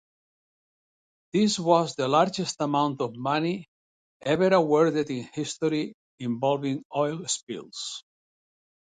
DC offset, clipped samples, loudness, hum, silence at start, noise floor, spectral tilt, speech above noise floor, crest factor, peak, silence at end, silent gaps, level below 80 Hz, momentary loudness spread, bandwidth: under 0.1%; under 0.1%; -26 LUFS; none; 1.35 s; under -90 dBFS; -5 dB/octave; over 65 dB; 20 dB; -6 dBFS; 0.85 s; 3.68-4.20 s, 5.94-6.18 s, 6.85-6.90 s, 7.43-7.47 s; -68 dBFS; 13 LU; 9.6 kHz